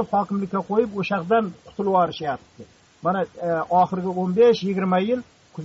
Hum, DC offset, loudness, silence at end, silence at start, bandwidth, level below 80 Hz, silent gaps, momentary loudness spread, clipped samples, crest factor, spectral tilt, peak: none; under 0.1%; -22 LUFS; 0 s; 0 s; 7.6 kHz; -60 dBFS; none; 11 LU; under 0.1%; 14 dB; -5.5 dB/octave; -8 dBFS